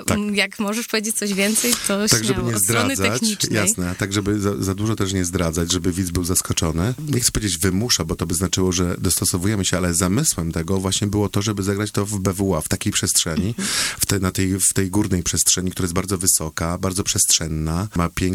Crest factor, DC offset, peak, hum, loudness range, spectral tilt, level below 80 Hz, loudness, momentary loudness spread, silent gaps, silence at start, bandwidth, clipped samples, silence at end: 20 dB; under 0.1%; 0 dBFS; none; 2 LU; -3.5 dB/octave; -38 dBFS; -19 LUFS; 5 LU; none; 0 s; 18.5 kHz; under 0.1%; 0 s